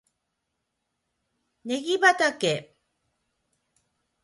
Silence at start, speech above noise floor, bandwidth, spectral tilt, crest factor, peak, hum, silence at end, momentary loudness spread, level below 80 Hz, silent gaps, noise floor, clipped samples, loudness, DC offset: 1.65 s; 57 dB; 11.5 kHz; -3 dB/octave; 22 dB; -6 dBFS; none; 1.6 s; 13 LU; -76 dBFS; none; -80 dBFS; under 0.1%; -23 LUFS; under 0.1%